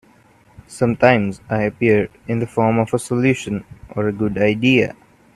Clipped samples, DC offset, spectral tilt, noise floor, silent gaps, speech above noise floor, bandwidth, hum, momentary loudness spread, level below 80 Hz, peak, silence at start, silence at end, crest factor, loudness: under 0.1%; under 0.1%; -6.5 dB/octave; -52 dBFS; none; 34 dB; 12.5 kHz; none; 10 LU; -50 dBFS; 0 dBFS; 0.7 s; 0.45 s; 18 dB; -18 LUFS